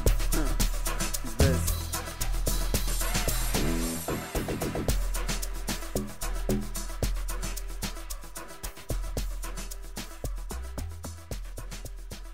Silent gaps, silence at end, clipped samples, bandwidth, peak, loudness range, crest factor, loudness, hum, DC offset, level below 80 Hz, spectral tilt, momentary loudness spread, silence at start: none; 0 s; under 0.1%; 16 kHz; -12 dBFS; 9 LU; 18 dB; -32 LUFS; none; 1%; -32 dBFS; -4 dB/octave; 12 LU; 0 s